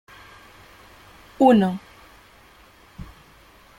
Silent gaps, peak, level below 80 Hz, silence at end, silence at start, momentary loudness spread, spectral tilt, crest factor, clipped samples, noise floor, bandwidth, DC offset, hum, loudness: none; -2 dBFS; -54 dBFS; 0.75 s; 1.4 s; 28 LU; -7.5 dB/octave; 22 dB; under 0.1%; -51 dBFS; 16 kHz; under 0.1%; none; -18 LUFS